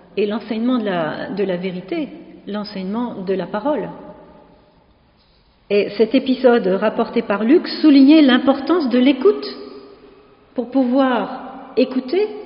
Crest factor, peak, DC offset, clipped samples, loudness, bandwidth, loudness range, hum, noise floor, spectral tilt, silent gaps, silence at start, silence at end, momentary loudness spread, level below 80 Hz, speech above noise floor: 16 dB; -2 dBFS; under 0.1%; under 0.1%; -17 LUFS; 5.4 kHz; 11 LU; none; -55 dBFS; -4 dB/octave; none; 0.15 s; 0 s; 15 LU; -60 dBFS; 38 dB